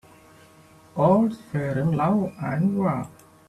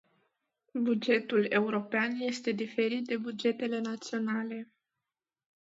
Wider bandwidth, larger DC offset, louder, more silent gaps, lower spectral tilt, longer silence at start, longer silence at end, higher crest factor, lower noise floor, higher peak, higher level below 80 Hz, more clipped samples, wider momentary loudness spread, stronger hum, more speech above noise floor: first, 13 kHz vs 8 kHz; neither; first, -23 LUFS vs -31 LUFS; neither; first, -9 dB/octave vs -5 dB/octave; first, 0.95 s vs 0.75 s; second, 0.4 s vs 0.95 s; about the same, 16 dB vs 20 dB; second, -52 dBFS vs under -90 dBFS; first, -8 dBFS vs -14 dBFS; first, -58 dBFS vs -84 dBFS; neither; first, 11 LU vs 8 LU; neither; second, 30 dB vs over 59 dB